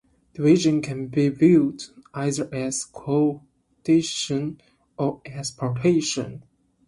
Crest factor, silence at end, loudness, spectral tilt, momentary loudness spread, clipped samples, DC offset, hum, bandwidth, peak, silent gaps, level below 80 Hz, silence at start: 18 dB; 0.45 s; -23 LUFS; -5.5 dB/octave; 15 LU; under 0.1%; under 0.1%; none; 11.5 kHz; -6 dBFS; none; -60 dBFS; 0.35 s